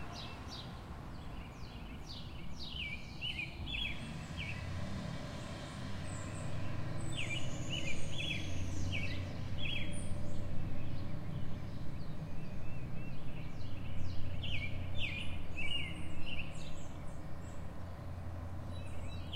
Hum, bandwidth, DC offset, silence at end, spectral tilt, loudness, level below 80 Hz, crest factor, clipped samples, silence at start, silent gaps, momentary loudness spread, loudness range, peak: none; 10 kHz; under 0.1%; 0 s; -5 dB/octave; -43 LUFS; -46 dBFS; 14 dB; under 0.1%; 0 s; none; 9 LU; 5 LU; -20 dBFS